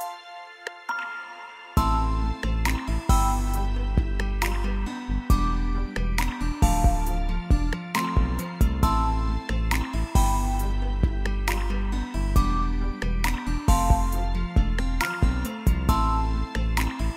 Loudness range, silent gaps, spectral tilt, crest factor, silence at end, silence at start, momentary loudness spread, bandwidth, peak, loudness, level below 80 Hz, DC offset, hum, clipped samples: 2 LU; none; -5.5 dB/octave; 18 dB; 0 s; 0 s; 7 LU; 16 kHz; -6 dBFS; -26 LUFS; -24 dBFS; under 0.1%; none; under 0.1%